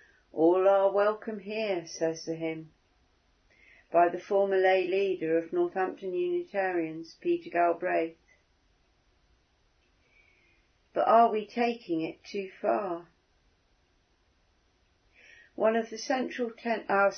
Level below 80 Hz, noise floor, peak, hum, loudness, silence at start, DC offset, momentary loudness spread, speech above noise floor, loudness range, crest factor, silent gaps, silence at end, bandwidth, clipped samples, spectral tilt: -74 dBFS; -69 dBFS; -10 dBFS; none; -29 LUFS; 0.35 s; under 0.1%; 13 LU; 41 dB; 8 LU; 20 dB; none; 0 s; 6.6 kHz; under 0.1%; -5 dB/octave